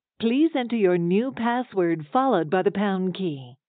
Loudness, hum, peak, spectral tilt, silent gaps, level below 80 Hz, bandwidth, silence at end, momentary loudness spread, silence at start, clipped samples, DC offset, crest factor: -24 LUFS; none; -8 dBFS; -5.5 dB/octave; none; -72 dBFS; 4.5 kHz; 0.15 s; 4 LU; 0.2 s; under 0.1%; under 0.1%; 16 dB